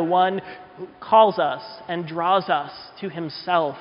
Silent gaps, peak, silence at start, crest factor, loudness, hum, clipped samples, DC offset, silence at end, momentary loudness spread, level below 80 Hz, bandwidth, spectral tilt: none; -4 dBFS; 0 s; 18 dB; -21 LUFS; none; under 0.1%; under 0.1%; 0 s; 21 LU; -68 dBFS; 5.4 kHz; -3 dB/octave